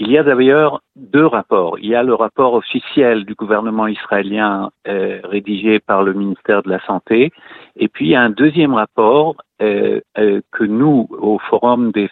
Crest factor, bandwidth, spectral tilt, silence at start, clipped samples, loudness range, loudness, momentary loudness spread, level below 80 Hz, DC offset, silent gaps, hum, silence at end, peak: 14 dB; 4.3 kHz; -9.5 dB/octave; 0 s; under 0.1%; 3 LU; -15 LUFS; 8 LU; -60 dBFS; under 0.1%; none; none; 0.05 s; 0 dBFS